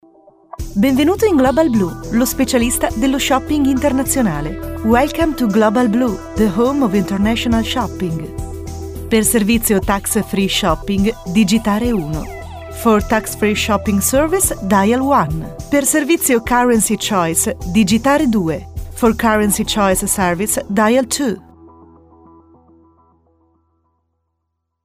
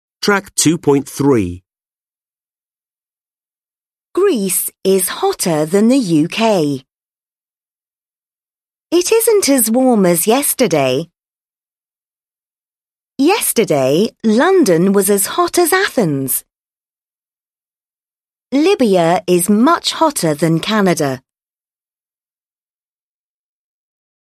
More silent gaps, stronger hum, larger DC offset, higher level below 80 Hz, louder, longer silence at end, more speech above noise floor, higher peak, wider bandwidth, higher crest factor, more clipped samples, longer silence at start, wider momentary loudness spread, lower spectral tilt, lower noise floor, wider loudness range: neither; neither; neither; first, -32 dBFS vs -56 dBFS; about the same, -15 LUFS vs -14 LUFS; about the same, 3.15 s vs 3.15 s; second, 58 dB vs over 77 dB; about the same, -2 dBFS vs 0 dBFS; first, 16 kHz vs 13.5 kHz; about the same, 14 dB vs 16 dB; neither; first, 0.6 s vs 0.2 s; first, 9 LU vs 6 LU; about the same, -4.5 dB/octave vs -4.5 dB/octave; second, -73 dBFS vs under -90 dBFS; second, 3 LU vs 6 LU